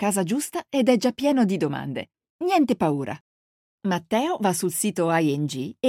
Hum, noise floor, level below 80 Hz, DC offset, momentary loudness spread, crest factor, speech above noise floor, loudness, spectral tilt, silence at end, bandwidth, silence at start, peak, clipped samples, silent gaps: none; under -90 dBFS; -68 dBFS; under 0.1%; 11 LU; 18 dB; over 67 dB; -24 LUFS; -5 dB/octave; 0 s; 16.5 kHz; 0 s; -6 dBFS; under 0.1%; 2.30-2.39 s, 3.21-3.78 s